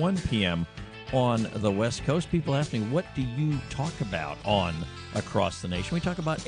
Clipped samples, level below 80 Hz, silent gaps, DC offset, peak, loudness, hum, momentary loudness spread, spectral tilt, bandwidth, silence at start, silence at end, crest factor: under 0.1%; -46 dBFS; none; under 0.1%; -10 dBFS; -29 LUFS; none; 6 LU; -6 dB/octave; 10.5 kHz; 0 s; 0 s; 18 dB